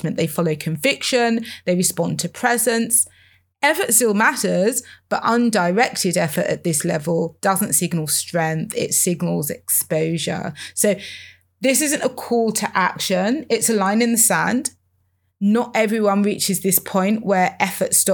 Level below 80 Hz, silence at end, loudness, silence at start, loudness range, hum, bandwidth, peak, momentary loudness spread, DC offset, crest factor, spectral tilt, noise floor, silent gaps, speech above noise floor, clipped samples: -68 dBFS; 0 s; -19 LUFS; 0 s; 3 LU; none; over 20 kHz; -2 dBFS; 7 LU; under 0.1%; 18 dB; -3.5 dB/octave; -66 dBFS; none; 47 dB; under 0.1%